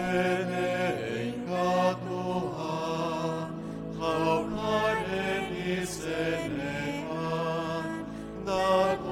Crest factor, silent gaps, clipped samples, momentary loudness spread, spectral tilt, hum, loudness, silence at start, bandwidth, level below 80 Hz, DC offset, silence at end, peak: 18 dB; none; under 0.1%; 7 LU; -5.5 dB/octave; none; -30 LUFS; 0 s; 16.5 kHz; -54 dBFS; under 0.1%; 0 s; -12 dBFS